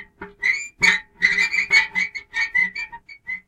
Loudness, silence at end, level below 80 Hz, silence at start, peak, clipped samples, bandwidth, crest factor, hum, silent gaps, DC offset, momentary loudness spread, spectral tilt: -19 LUFS; 0.1 s; -54 dBFS; 0 s; -2 dBFS; under 0.1%; 14.5 kHz; 20 dB; none; none; under 0.1%; 15 LU; -0.5 dB/octave